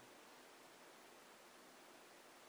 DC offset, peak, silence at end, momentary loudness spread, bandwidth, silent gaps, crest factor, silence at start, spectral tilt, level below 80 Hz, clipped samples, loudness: under 0.1%; -50 dBFS; 0 s; 1 LU; over 20 kHz; none; 12 dB; 0 s; -1.5 dB/octave; under -90 dBFS; under 0.1%; -62 LUFS